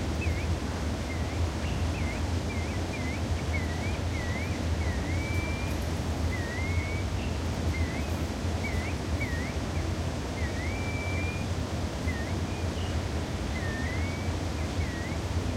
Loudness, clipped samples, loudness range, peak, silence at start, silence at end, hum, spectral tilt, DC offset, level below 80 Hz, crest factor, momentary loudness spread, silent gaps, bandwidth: -31 LUFS; under 0.1%; 1 LU; -16 dBFS; 0 s; 0 s; none; -5.5 dB/octave; under 0.1%; -36 dBFS; 14 dB; 2 LU; none; 15 kHz